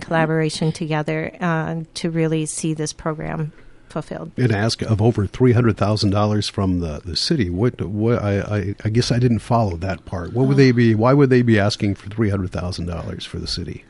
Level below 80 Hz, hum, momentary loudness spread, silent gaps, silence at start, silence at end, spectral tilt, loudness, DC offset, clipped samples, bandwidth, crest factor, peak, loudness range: -38 dBFS; none; 12 LU; none; 0 s; 0.1 s; -6 dB/octave; -20 LUFS; under 0.1%; under 0.1%; 11.5 kHz; 16 dB; -4 dBFS; 6 LU